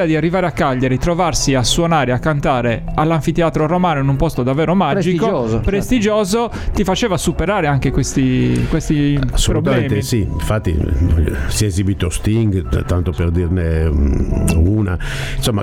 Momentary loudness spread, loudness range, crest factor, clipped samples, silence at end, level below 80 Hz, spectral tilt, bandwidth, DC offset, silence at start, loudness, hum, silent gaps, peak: 4 LU; 2 LU; 14 dB; under 0.1%; 0 s; -24 dBFS; -5.5 dB/octave; 16.5 kHz; under 0.1%; 0 s; -16 LUFS; none; none; 0 dBFS